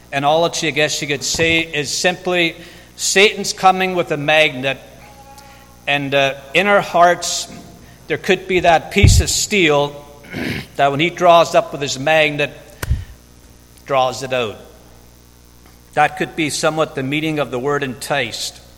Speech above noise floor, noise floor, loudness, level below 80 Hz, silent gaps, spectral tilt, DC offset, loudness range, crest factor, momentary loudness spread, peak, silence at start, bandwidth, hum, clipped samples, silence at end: 29 dB; -45 dBFS; -16 LUFS; -32 dBFS; none; -3.5 dB/octave; under 0.1%; 6 LU; 18 dB; 12 LU; 0 dBFS; 0.1 s; 17 kHz; 60 Hz at -45 dBFS; under 0.1%; 0.2 s